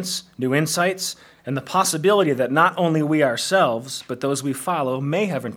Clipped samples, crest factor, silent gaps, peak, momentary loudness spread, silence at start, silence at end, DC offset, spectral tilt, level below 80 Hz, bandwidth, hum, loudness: under 0.1%; 18 dB; none; -2 dBFS; 10 LU; 0 s; 0 s; under 0.1%; -4.5 dB/octave; -70 dBFS; 18.5 kHz; none; -21 LUFS